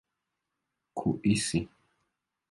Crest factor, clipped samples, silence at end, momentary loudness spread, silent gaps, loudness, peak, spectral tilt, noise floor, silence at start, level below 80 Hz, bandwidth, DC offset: 20 dB; under 0.1%; 0.85 s; 15 LU; none; -30 LUFS; -14 dBFS; -5 dB/octave; -85 dBFS; 0.95 s; -58 dBFS; 11.5 kHz; under 0.1%